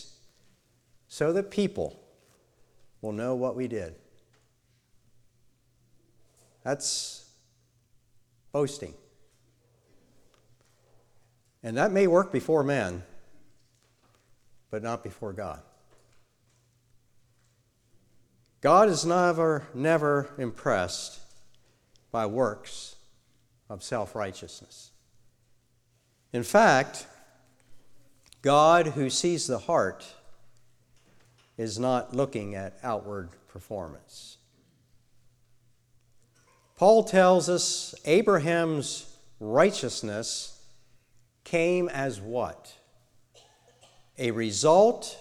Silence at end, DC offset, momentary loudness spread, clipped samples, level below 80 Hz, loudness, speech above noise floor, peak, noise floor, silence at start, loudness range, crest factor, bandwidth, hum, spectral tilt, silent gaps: 0 s; under 0.1%; 22 LU; under 0.1%; -64 dBFS; -26 LUFS; 43 dB; -6 dBFS; -68 dBFS; 0 s; 16 LU; 24 dB; 14.5 kHz; none; -4.5 dB/octave; none